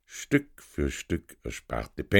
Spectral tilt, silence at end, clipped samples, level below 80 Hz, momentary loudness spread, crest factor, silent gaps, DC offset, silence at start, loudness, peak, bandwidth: -5 dB/octave; 0 s; under 0.1%; -42 dBFS; 12 LU; 24 dB; none; under 0.1%; 0.1 s; -32 LUFS; -4 dBFS; 18 kHz